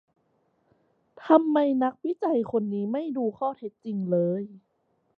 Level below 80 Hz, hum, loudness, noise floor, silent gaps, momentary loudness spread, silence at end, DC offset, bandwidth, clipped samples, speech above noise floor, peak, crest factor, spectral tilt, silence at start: -74 dBFS; none; -26 LUFS; -70 dBFS; none; 13 LU; 0.6 s; under 0.1%; 4.8 kHz; under 0.1%; 45 dB; -6 dBFS; 22 dB; -10 dB/octave; 1.2 s